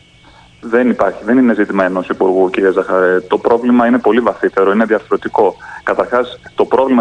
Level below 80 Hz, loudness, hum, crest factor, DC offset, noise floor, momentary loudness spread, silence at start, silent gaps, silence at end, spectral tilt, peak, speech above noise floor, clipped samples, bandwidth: -50 dBFS; -13 LUFS; none; 12 dB; under 0.1%; -43 dBFS; 6 LU; 0.65 s; none; 0 s; -7 dB/octave; 0 dBFS; 31 dB; under 0.1%; 9.4 kHz